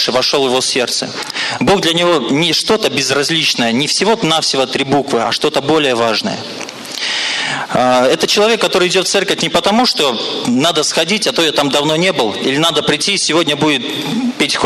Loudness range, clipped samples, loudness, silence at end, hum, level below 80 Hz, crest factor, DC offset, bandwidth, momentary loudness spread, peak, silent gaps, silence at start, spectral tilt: 2 LU; under 0.1%; -13 LUFS; 0 s; none; -52 dBFS; 10 dB; under 0.1%; 14 kHz; 6 LU; -4 dBFS; none; 0 s; -3 dB/octave